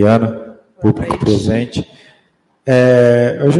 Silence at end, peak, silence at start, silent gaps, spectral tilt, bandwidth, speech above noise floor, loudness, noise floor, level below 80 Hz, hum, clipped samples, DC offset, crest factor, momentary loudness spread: 0 s; 0 dBFS; 0 s; none; -7.5 dB/octave; 11.5 kHz; 45 dB; -13 LUFS; -57 dBFS; -42 dBFS; none; under 0.1%; under 0.1%; 14 dB; 16 LU